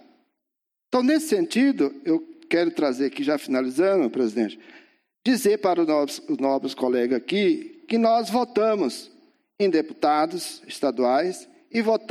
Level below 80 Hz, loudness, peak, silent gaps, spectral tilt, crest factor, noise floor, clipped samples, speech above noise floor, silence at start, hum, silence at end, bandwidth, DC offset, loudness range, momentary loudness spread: -74 dBFS; -23 LUFS; -6 dBFS; none; -4.5 dB/octave; 16 dB; -84 dBFS; under 0.1%; 61 dB; 0.9 s; none; 0.05 s; 14.5 kHz; under 0.1%; 2 LU; 7 LU